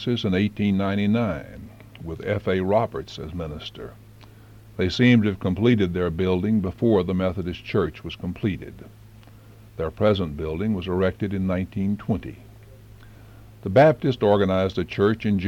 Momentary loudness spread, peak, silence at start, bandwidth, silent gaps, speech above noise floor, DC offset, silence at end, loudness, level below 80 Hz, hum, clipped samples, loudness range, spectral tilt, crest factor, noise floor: 17 LU; -6 dBFS; 0 s; 15 kHz; none; 24 dB; under 0.1%; 0 s; -23 LUFS; -46 dBFS; none; under 0.1%; 6 LU; -8 dB/octave; 18 dB; -47 dBFS